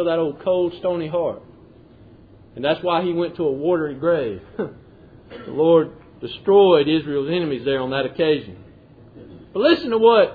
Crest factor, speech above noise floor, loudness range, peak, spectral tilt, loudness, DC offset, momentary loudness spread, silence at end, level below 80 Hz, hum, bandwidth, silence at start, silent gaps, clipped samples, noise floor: 18 dB; 28 dB; 5 LU; -2 dBFS; -9 dB/octave; -20 LUFS; under 0.1%; 16 LU; 0 s; -54 dBFS; none; 5 kHz; 0 s; none; under 0.1%; -47 dBFS